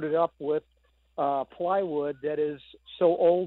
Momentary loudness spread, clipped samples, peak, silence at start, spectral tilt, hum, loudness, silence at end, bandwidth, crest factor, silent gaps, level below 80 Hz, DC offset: 10 LU; under 0.1%; -12 dBFS; 0 s; -9.5 dB/octave; none; -28 LUFS; 0 s; 4.2 kHz; 16 dB; none; -68 dBFS; under 0.1%